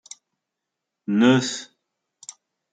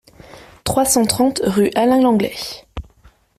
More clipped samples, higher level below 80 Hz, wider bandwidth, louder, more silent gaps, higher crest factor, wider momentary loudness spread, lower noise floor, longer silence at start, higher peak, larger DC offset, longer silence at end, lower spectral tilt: neither; second, -74 dBFS vs -42 dBFS; second, 9.4 kHz vs 15.5 kHz; second, -20 LUFS vs -16 LUFS; neither; about the same, 20 dB vs 16 dB; first, 24 LU vs 17 LU; first, -83 dBFS vs -51 dBFS; first, 1.1 s vs 0.35 s; second, -6 dBFS vs -2 dBFS; neither; first, 1.1 s vs 0.55 s; about the same, -5 dB/octave vs -4 dB/octave